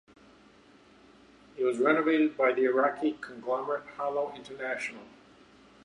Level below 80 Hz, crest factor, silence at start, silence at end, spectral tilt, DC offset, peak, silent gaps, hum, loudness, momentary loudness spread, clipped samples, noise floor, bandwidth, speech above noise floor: -74 dBFS; 22 dB; 1.55 s; 0.75 s; -5.5 dB/octave; under 0.1%; -10 dBFS; none; none; -29 LUFS; 13 LU; under 0.1%; -58 dBFS; 10.5 kHz; 29 dB